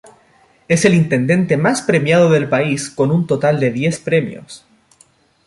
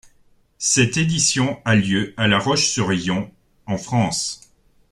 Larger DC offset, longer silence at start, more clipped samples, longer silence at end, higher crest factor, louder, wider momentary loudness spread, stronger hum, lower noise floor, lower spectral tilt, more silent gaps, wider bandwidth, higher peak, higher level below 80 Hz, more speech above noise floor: neither; about the same, 0.7 s vs 0.6 s; neither; first, 0.9 s vs 0.55 s; about the same, 16 dB vs 18 dB; first, -15 LUFS vs -19 LUFS; second, 6 LU vs 11 LU; neither; about the same, -53 dBFS vs -56 dBFS; first, -6 dB/octave vs -3.5 dB/octave; neither; second, 11.5 kHz vs 13 kHz; about the same, 0 dBFS vs -2 dBFS; about the same, -54 dBFS vs -50 dBFS; about the same, 39 dB vs 37 dB